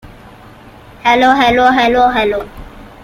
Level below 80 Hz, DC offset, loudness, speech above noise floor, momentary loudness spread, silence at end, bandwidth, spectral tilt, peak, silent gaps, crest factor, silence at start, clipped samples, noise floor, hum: -38 dBFS; under 0.1%; -11 LUFS; 27 dB; 10 LU; 0.2 s; 14.5 kHz; -4.5 dB/octave; 0 dBFS; none; 12 dB; 0.05 s; under 0.1%; -38 dBFS; none